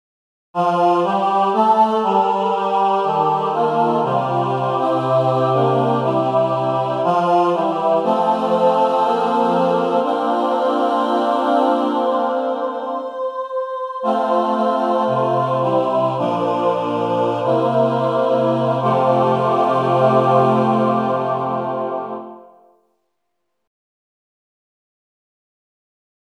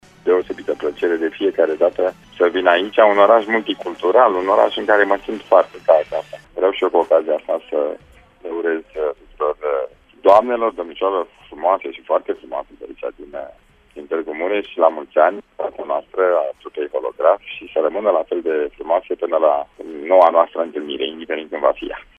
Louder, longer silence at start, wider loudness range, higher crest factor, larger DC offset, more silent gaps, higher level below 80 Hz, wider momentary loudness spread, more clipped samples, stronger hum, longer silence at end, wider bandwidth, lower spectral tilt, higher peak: about the same, -17 LUFS vs -18 LUFS; first, 0.55 s vs 0.25 s; second, 4 LU vs 7 LU; about the same, 16 dB vs 18 dB; neither; neither; second, -72 dBFS vs -56 dBFS; second, 6 LU vs 14 LU; neither; neither; first, 3.8 s vs 0.15 s; first, 10.5 kHz vs 7.6 kHz; first, -7.5 dB/octave vs -5 dB/octave; about the same, -2 dBFS vs 0 dBFS